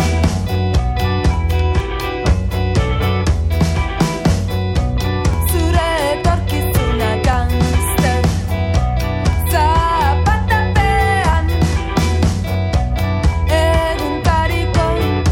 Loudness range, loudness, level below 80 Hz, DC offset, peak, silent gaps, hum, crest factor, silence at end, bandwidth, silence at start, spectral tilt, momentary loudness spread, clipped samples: 2 LU; -16 LUFS; -20 dBFS; under 0.1%; -2 dBFS; none; none; 12 dB; 0 s; 17 kHz; 0 s; -6 dB/octave; 4 LU; under 0.1%